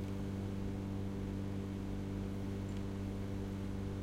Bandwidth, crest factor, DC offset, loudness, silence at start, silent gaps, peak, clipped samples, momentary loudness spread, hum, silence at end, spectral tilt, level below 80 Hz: 15.5 kHz; 12 dB; under 0.1%; -42 LUFS; 0 s; none; -28 dBFS; under 0.1%; 1 LU; none; 0 s; -7.5 dB/octave; -50 dBFS